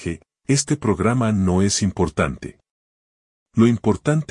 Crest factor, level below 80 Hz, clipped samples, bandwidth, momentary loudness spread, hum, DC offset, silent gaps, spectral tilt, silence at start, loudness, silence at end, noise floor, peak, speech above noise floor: 18 dB; -46 dBFS; under 0.1%; 11 kHz; 12 LU; none; under 0.1%; 2.71-3.46 s; -5.5 dB/octave; 0 s; -20 LUFS; 0.05 s; under -90 dBFS; -2 dBFS; over 71 dB